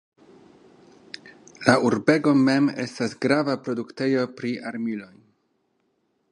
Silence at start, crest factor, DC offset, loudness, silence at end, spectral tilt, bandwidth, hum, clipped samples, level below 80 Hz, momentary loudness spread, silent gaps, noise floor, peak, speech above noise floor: 1.25 s; 24 dB; under 0.1%; -23 LUFS; 1.25 s; -6 dB/octave; 11 kHz; none; under 0.1%; -68 dBFS; 16 LU; none; -71 dBFS; 0 dBFS; 48 dB